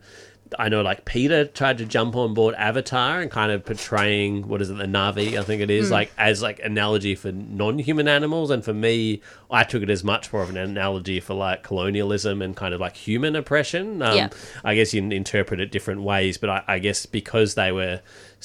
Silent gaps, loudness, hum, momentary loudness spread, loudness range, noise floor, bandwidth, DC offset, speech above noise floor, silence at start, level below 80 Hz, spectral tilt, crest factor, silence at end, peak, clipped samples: none; -23 LUFS; none; 8 LU; 3 LU; -48 dBFS; 14 kHz; under 0.1%; 25 dB; 0.15 s; -50 dBFS; -5 dB/octave; 22 dB; 0.15 s; -2 dBFS; under 0.1%